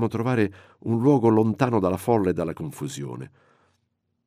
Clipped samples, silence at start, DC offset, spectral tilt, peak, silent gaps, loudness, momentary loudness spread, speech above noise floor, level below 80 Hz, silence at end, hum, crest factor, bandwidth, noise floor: under 0.1%; 0 s; under 0.1%; -7.5 dB/octave; -6 dBFS; none; -23 LUFS; 16 LU; 51 dB; -60 dBFS; 1 s; none; 18 dB; 15.5 kHz; -74 dBFS